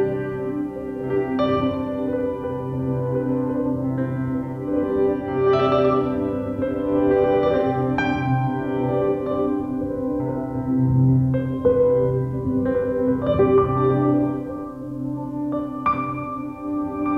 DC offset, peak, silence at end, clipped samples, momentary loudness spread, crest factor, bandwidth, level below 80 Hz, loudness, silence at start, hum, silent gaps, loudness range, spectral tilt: under 0.1%; -6 dBFS; 0 s; under 0.1%; 9 LU; 14 dB; 6 kHz; -44 dBFS; -22 LUFS; 0 s; none; none; 4 LU; -10 dB/octave